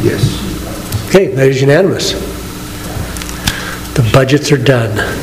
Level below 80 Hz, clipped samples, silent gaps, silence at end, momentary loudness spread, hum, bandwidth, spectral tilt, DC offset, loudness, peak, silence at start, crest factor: -28 dBFS; 0.5%; none; 0 s; 13 LU; none; 16.5 kHz; -5.5 dB/octave; under 0.1%; -13 LUFS; 0 dBFS; 0 s; 12 dB